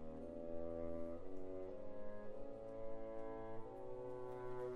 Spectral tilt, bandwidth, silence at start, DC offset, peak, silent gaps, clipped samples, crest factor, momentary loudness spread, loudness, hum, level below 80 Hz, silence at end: -8.5 dB/octave; 4.4 kHz; 0 s; under 0.1%; -32 dBFS; none; under 0.1%; 12 dB; 5 LU; -51 LUFS; none; -60 dBFS; 0 s